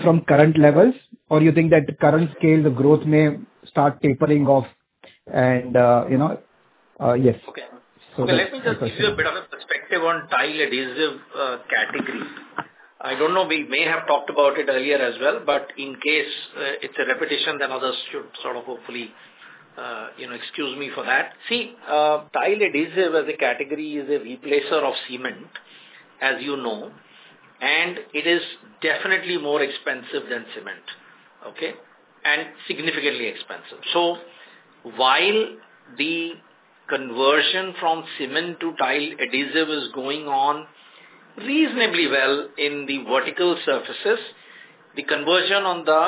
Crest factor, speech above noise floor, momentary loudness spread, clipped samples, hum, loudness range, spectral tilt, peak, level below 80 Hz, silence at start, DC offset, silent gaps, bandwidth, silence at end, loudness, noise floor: 22 dB; 36 dB; 16 LU; under 0.1%; none; 7 LU; -9.5 dB/octave; 0 dBFS; -62 dBFS; 0 s; under 0.1%; none; 4 kHz; 0 s; -21 LUFS; -57 dBFS